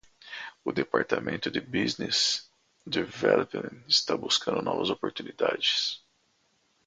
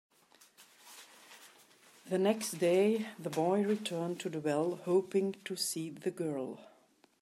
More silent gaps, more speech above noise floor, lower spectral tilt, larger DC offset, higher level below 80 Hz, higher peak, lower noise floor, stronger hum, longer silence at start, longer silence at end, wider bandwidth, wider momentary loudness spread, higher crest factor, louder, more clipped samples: neither; first, 42 dB vs 34 dB; second, -3 dB/octave vs -5 dB/octave; neither; first, -66 dBFS vs -86 dBFS; first, -8 dBFS vs -16 dBFS; about the same, -70 dBFS vs -67 dBFS; neither; second, 0.25 s vs 0.6 s; first, 0.9 s vs 0.55 s; second, 9.6 kHz vs 15.5 kHz; second, 11 LU vs 23 LU; about the same, 22 dB vs 18 dB; first, -28 LUFS vs -34 LUFS; neither